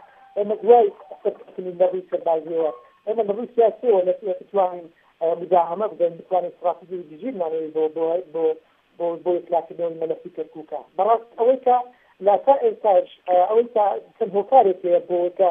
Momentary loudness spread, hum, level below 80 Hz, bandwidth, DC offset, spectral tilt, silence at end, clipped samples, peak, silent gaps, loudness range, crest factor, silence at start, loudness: 14 LU; none; -78 dBFS; 3.7 kHz; under 0.1%; -9 dB/octave; 0 s; under 0.1%; -2 dBFS; none; 6 LU; 20 dB; 0.35 s; -21 LUFS